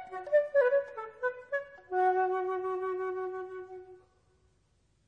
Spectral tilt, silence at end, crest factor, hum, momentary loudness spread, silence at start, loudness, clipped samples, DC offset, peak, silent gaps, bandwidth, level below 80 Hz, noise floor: -6 dB/octave; 1.1 s; 16 dB; none; 15 LU; 0 s; -31 LUFS; under 0.1%; under 0.1%; -16 dBFS; none; 6 kHz; -76 dBFS; -71 dBFS